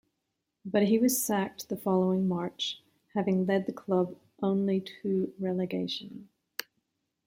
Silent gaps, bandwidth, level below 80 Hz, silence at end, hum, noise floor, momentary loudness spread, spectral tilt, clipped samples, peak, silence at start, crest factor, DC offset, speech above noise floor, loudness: none; 16.5 kHz; -72 dBFS; 0.65 s; none; -83 dBFS; 14 LU; -5 dB/octave; under 0.1%; -12 dBFS; 0.65 s; 18 dB; under 0.1%; 54 dB; -30 LUFS